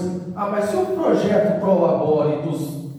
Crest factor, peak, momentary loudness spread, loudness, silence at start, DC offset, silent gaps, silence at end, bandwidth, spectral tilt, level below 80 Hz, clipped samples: 14 dB; -6 dBFS; 8 LU; -20 LUFS; 0 s; under 0.1%; none; 0 s; 15.5 kHz; -7.5 dB/octave; -62 dBFS; under 0.1%